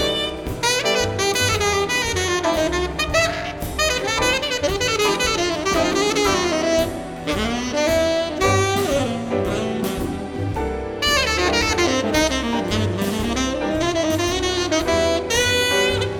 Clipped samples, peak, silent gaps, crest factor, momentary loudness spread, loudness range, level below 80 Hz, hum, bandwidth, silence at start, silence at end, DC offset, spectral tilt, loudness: under 0.1%; -2 dBFS; none; 18 dB; 6 LU; 2 LU; -36 dBFS; none; 19.5 kHz; 0 s; 0 s; under 0.1%; -3.5 dB/octave; -20 LUFS